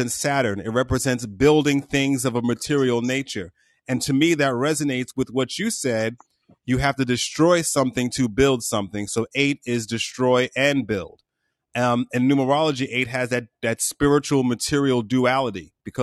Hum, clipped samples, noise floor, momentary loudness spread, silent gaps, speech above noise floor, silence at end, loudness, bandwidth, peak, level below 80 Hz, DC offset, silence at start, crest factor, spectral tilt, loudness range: none; under 0.1%; -73 dBFS; 8 LU; none; 51 dB; 0 s; -22 LUFS; 13 kHz; -6 dBFS; -46 dBFS; under 0.1%; 0 s; 16 dB; -4.5 dB/octave; 2 LU